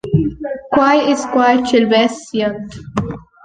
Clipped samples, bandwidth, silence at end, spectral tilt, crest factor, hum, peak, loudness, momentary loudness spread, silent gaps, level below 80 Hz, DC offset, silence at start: under 0.1%; 9.6 kHz; 0.25 s; -5.5 dB/octave; 14 dB; none; 0 dBFS; -15 LUFS; 12 LU; none; -42 dBFS; under 0.1%; 0.05 s